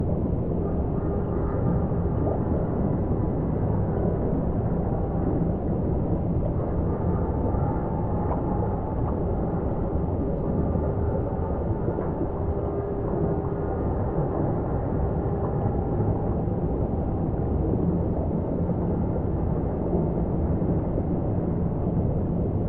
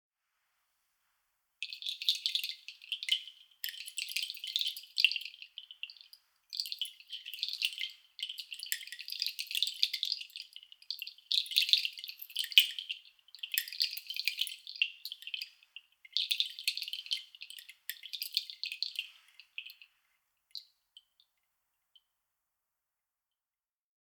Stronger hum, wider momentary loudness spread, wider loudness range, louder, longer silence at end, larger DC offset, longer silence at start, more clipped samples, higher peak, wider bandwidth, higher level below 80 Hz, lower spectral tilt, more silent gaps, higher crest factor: neither; second, 2 LU vs 18 LU; second, 1 LU vs 10 LU; first, -26 LUFS vs -34 LUFS; second, 0 s vs 3.5 s; neither; second, 0 s vs 1.6 s; neither; second, -12 dBFS vs -4 dBFS; second, 3.2 kHz vs over 20 kHz; first, -32 dBFS vs under -90 dBFS; first, -12 dB/octave vs 9 dB/octave; neither; second, 14 dB vs 36 dB